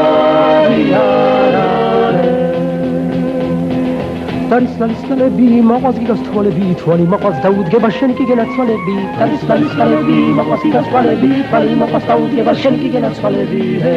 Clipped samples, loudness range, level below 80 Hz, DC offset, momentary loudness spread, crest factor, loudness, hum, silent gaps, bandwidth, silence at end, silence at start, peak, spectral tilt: under 0.1%; 2 LU; -44 dBFS; under 0.1%; 6 LU; 12 dB; -13 LUFS; none; none; 7.6 kHz; 0 s; 0 s; 0 dBFS; -8.5 dB/octave